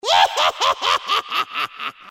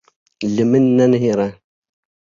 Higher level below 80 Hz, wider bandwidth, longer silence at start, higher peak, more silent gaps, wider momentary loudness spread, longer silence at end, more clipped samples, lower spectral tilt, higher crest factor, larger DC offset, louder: second, -62 dBFS vs -56 dBFS; first, 16.5 kHz vs 7.4 kHz; second, 0.05 s vs 0.4 s; about the same, -2 dBFS vs -4 dBFS; neither; about the same, 10 LU vs 11 LU; second, 0 s vs 0.8 s; neither; second, 0.5 dB/octave vs -7.5 dB/octave; about the same, 18 dB vs 14 dB; neither; second, -19 LUFS vs -16 LUFS